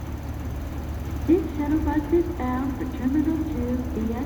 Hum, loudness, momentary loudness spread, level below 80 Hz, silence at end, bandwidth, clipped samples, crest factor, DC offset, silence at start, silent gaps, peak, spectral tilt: none; -26 LUFS; 10 LU; -34 dBFS; 0 s; over 20 kHz; under 0.1%; 16 dB; under 0.1%; 0 s; none; -8 dBFS; -8 dB/octave